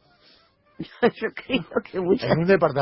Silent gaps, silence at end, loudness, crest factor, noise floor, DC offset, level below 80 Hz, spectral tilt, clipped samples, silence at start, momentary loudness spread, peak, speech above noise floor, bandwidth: none; 0 s; -23 LUFS; 18 dB; -59 dBFS; under 0.1%; -56 dBFS; -11 dB/octave; under 0.1%; 0.8 s; 13 LU; -6 dBFS; 36 dB; 5.8 kHz